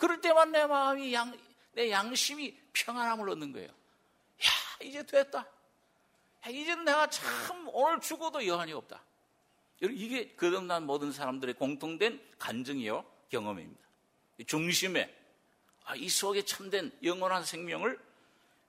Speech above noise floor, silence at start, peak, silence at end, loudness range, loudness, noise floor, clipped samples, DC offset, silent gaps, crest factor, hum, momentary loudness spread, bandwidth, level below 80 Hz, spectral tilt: 39 dB; 0 s; -12 dBFS; 0.7 s; 4 LU; -32 LUFS; -71 dBFS; under 0.1%; under 0.1%; none; 22 dB; none; 14 LU; 16 kHz; -80 dBFS; -2.5 dB/octave